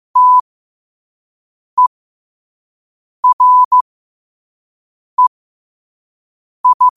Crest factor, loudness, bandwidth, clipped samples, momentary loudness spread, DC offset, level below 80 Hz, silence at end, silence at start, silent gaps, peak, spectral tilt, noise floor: 12 dB; -12 LUFS; 1.3 kHz; under 0.1%; 9 LU; under 0.1%; -68 dBFS; 0.05 s; 0.15 s; 0.41-1.77 s, 1.87-3.23 s, 3.33-3.39 s, 3.65-3.71 s, 3.81-5.18 s, 5.27-6.64 s, 6.74-6.80 s; -4 dBFS; -1 dB/octave; under -90 dBFS